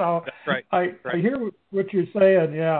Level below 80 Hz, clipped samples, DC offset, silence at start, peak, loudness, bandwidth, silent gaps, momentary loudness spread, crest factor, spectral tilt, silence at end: -66 dBFS; under 0.1%; under 0.1%; 0 s; -6 dBFS; -23 LUFS; 4.3 kHz; none; 10 LU; 16 dB; -10.5 dB/octave; 0 s